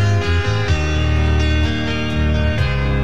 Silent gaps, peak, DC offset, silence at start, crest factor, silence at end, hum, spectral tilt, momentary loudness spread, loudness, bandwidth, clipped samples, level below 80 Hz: none; -4 dBFS; 4%; 0 s; 12 dB; 0 s; none; -6 dB/octave; 3 LU; -18 LUFS; 8 kHz; under 0.1%; -22 dBFS